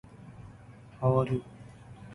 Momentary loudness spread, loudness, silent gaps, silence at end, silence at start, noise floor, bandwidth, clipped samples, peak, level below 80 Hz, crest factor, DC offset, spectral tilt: 24 LU; -29 LUFS; none; 0 s; 0.15 s; -51 dBFS; 10.5 kHz; under 0.1%; -14 dBFS; -58 dBFS; 20 dB; under 0.1%; -9.5 dB/octave